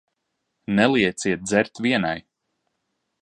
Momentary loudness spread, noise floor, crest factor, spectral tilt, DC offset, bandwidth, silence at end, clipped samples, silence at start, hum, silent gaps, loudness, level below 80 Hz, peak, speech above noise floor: 10 LU; -77 dBFS; 22 dB; -4.5 dB/octave; under 0.1%; 11.5 kHz; 1 s; under 0.1%; 0.7 s; none; none; -21 LUFS; -58 dBFS; -2 dBFS; 56 dB